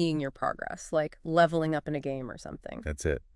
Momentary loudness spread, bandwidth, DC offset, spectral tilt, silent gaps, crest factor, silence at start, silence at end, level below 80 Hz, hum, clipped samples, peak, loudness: 14 LU; 12 kHz; under 0.1%; -6 dB/octave; none; 20 dB; 0 s; 0.15 s; -48 dBFS; none; under 0.1%; -10 dBFS; -30 LUFS